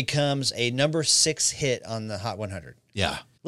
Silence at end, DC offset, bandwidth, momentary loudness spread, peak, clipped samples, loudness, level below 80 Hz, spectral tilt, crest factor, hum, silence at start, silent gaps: 0 s; under 0.1%; 15.5 kHz; 15 LU; -6 dBFS; under 0.1%; -24 LUFS; -54 dBFS; -3 dB/octave; 20 dB; none; 0 s; none